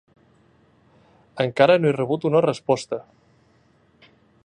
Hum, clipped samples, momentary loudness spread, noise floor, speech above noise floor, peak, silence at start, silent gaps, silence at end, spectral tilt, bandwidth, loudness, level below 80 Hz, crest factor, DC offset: none; under 0.1%; 16 LU; -59 dBFS; 39 dB; -2 dBFS; 1.35 s; none; 1.45 s; -6.5 dB/octave; 10 kHz; -21 LUFS; -66 dBFS; 22 dB; under 0.1%